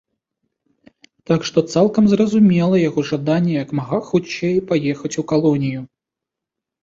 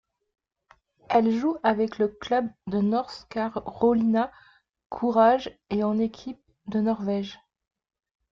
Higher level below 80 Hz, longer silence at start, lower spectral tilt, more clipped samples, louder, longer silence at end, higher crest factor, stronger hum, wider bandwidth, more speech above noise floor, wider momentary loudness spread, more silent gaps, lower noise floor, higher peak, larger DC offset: about the same, -56 dBFS vs -60 dBFS; first, 1.3 s vs 1.1 s; about the same, -7 dB/octave vs -7.5 dB/octave; neither; first, -18 LUFS vs -25 LUFS; about the same, 1 s vs 0.95 s; about the same, 16 dB vs 18 dB; neither; about the same, 7.8 kHz vs 7.2 kHz; first, 68 dB vs 37 dB; about the same, 9 LU vs 11 LU; second, none vs 4.86-4.90 s; first, -84 dBFS vs -62 dBFS; first, -2 dBFS vs -8 dBFS; neither